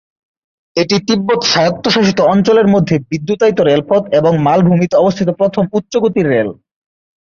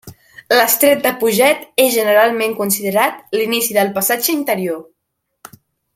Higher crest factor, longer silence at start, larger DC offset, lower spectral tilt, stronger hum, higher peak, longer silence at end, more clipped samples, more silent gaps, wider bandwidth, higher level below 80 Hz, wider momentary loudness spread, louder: about the same, 12 dB vs 16 dB; first, 0.75 s vs 0.05 s; neither; first, -6 dB/octave vs -2.5 dB/octave; neither; about the same, 0 dBFS vs 0 dBFS; second, 0.75 s vs 1.15 s; neither; neither; second, 7.2 kHz vs 16.5 kHz; first, -50 dBFS vs -62 dBFS; about the same, 6 LU vs 7 LU; first, -12 LUFS vs -15 LUFS